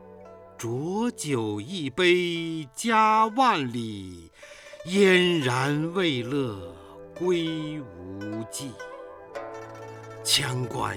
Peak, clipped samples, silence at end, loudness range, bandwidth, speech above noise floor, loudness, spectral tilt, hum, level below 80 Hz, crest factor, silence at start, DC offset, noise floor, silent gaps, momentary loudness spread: -8 dBFS; under 0.1%; 0 s; 9 LU; 18 kHz; 21 dB; -25 LUFS; -4.5 dB/octave; none; -62 dBFS; 18 dB; 0 s; under 0.1%; -47 dBFS; none; 21 LU